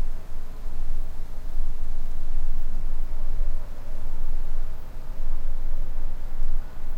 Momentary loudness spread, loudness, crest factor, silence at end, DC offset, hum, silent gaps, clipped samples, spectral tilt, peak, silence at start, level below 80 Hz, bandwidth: 6 LU; -35 LUFS; 8 dB; 0 s; under 0.1%; none; none; under 0.1%; -6.5 dB/octave; -10 dBFS; 0 s; -22 dBFS; 1.5 kHz